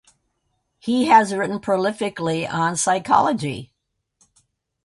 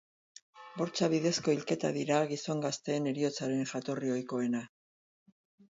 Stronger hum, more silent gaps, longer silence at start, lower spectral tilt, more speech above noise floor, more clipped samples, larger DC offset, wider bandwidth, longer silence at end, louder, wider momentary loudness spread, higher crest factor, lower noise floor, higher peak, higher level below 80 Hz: neither; neither; first, 0.85 s vs 0.55 s; about the same, -4.5 dB/octave vs -5 dB/octave; second, 52 dB vs over 58 dB; neither; neither; first, 11.5 kHz vs 8 kHz; about the same, 1.2 s vs 1.1 s; first, -20 LUFS vs -33 LUFS; first, 11 LU vs 8 LU; about the same, 20 dB vs 20 dB; second, -72 dBFS vs under -90 dBFS; first, -2 dBFS vs -14 dBFS; first, -60 dBFS vs -78 dBFS